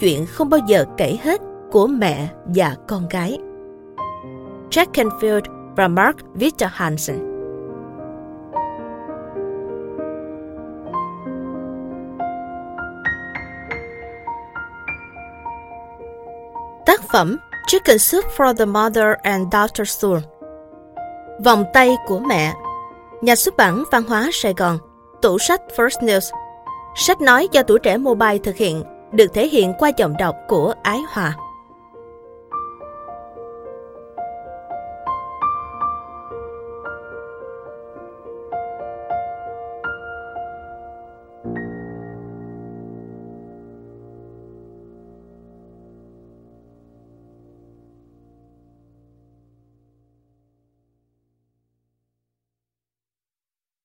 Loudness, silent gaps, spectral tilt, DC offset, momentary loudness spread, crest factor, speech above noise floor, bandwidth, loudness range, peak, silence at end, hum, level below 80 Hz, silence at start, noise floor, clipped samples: -18 LUFS; none; -4 dB/octave; under 0.1%; 21 LU; 20 dB; over 74 dB; 17 kHz; 16 LU; 0 dBFS; 9.05 s; none; -48 dBFS; 0 s; under -90 dBFS; under 0.1%